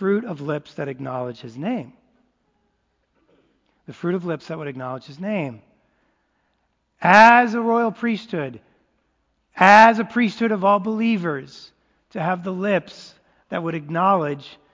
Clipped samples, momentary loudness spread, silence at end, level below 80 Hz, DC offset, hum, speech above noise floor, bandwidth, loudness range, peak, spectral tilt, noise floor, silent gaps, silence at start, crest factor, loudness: under 0.1%; 20 LU; 0.25 s; -66 dBFS; under 0.1%; none; 50 dB; 8 kHz; 14 LU; 0 dBFS; -6 dB/octave; -70 dBFS; none; 0 s; 22 dB; -19 LUFS